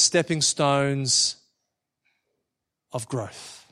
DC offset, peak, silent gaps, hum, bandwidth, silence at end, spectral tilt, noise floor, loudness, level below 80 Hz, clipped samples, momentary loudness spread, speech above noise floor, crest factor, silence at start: under 0.1%; -6 dBFS; none; none; 14 kHz; 0.15 s; -3 dB/octave; -83 dBFS; -22 LUFS; -66 dBFS; under 0.1%; 17 LU; 59 dB; 20 dB; 0 s